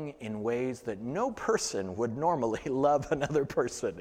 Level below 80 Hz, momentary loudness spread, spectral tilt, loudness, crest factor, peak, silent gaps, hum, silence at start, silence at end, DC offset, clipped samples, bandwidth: -58 dBFS; 8 LU; -5 dB/octave; -31 LUFS; 18 dB; -14 dBFS; none; none; 0 s; 0 s; under 0.1%; under 0.1%; 15.5 kHz